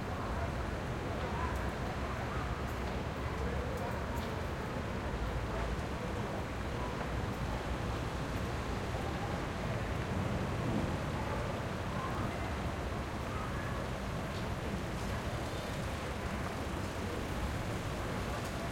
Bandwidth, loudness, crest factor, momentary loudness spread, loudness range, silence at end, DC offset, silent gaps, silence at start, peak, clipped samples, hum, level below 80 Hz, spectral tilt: 16.5 kHz; -38 LUFS; 14 dB; 2 LU; 2 LU; 0 s; under 0.1%; none; 0 s; -22 dBFS; under 0.1%; none; -44 dBFS; -6 dB/octave